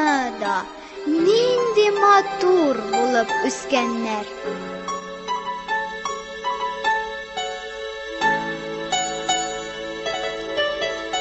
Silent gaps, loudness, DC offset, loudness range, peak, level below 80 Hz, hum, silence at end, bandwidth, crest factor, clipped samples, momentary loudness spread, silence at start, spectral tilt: none; -22 LUFS; under 0.1%; 8 LU; -4 dBFS; -54 dBFS; none; 0 s; 8.4 kHz; 18 dB; under 0.1%; 12 LU; 0 s; -2.5 dB/octave